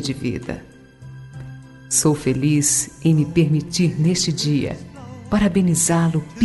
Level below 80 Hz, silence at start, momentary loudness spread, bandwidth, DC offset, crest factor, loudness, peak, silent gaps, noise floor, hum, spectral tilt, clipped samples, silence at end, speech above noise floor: -44 dBFS; 0 s; 20 LU; 12 kHz; under 0.1%; 16 dB; -19 LUFS; -4 dBFS; none; -39 dBFS; none; -5 dB/octave; under 0.1%; 0 s; 21 dB